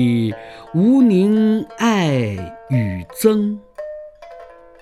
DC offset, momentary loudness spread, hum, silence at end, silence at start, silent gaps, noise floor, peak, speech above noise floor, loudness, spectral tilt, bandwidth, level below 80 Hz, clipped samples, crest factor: 0.1%; 19 LU; none; 0.35 s; 0 s; none; -40 dBFS; 0 dBFS; 24 dB; -17 LUFS; -7 dB/octave; 14.5 kHz; -52 dBFS; under 0.1%; 16 dB